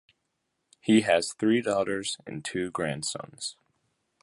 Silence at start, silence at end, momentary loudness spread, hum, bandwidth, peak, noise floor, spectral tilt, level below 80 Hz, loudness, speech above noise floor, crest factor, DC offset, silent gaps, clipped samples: 0.85 s; 0.7 s; 14 LU; none; 11.5 kHz; -8 dBFS; -79 dBFS; -4 dB/octave; -64 dBFS; -28 LUFS; 52 dB; 20 dB; under 0.1%; none; under 0.1%